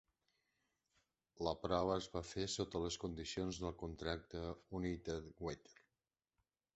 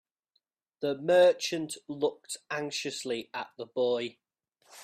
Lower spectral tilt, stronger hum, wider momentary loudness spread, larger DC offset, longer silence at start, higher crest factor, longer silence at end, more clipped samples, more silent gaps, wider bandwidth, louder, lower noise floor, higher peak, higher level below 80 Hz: about the same, -4.5 dB/octave vs -3.5 dB/octave; neither; second, 9 LU vs 16 LU; neither; first, 1.35 s vs 0.8 s; first, 24 dB vs 18 dB; first, 1.05 s vs 0 s; neither; neither; second, 8 kHz vs 14.5 kHz; second, -44 LUFS vs -30 LUFS; first, under -90 dBFS vs -78 dBFS; second, -22 dBFS vs -12 dBFS; first, -60 dBFS vs -78 dBFS